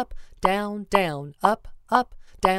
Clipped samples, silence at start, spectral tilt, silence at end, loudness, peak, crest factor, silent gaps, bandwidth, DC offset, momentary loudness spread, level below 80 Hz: under 0.1%; 0 s; -5 dB/octave; 0 s; -25 LUFS; -2 dBFS; 22 dB; none; 16 kHz; under 0.1%; 8 LU; -44 dBFS